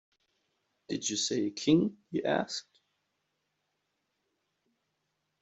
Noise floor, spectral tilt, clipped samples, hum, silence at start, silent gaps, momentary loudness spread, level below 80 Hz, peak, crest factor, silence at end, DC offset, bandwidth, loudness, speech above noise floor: -81 dBFS; -4 dB/octave; under 0.1%; none; 0.9 s; none; 11 LU; -74 dBFS; -14 dBFS; 22 dB; 2.8 s; under 0.1%; 8.2 kHz; -31 LUFS; 51 dB